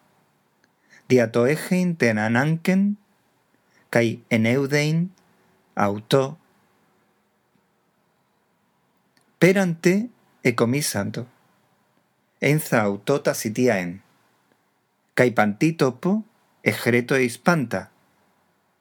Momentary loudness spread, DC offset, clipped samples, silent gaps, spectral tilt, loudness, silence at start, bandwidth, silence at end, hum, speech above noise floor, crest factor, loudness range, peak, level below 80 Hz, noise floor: 9 LU; under 0.1%; under 0.1%; none; -6 dB/octave; -22 LUFS; 1.1 s; over 20 kHz; 0.95 s; none; 47 dB; 22 dB; 5 LU; -2 dBFS; -74 dBFS; -68 dBFS